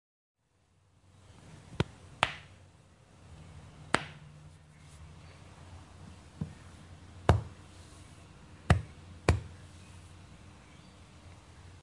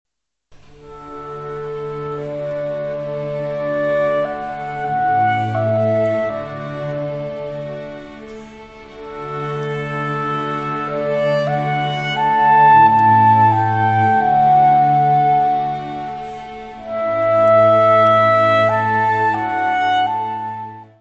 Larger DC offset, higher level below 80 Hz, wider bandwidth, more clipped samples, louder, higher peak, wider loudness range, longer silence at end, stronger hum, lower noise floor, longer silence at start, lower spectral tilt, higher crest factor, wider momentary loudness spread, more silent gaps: neither; about the same, -50 dBFS vs -52 dBFS; first, 11.5 kHz vs 7.8 kHz; neither; second, -33 LUFS vs -16 LUFS; about the same, -4 dBFS vs -2 dBFS; second, 8 LU vs 13 LU; about the same, 0.05 s vs 0.15 s; neither; first, -70 dBFS vs -51 dBFS; first, 1.45 s vs 0.85 s; second, -5.5 dB/octave vs -7.5 dB/octave; first, 34 dB vs 14 dB; first, 24 LU vs 18 LU; neither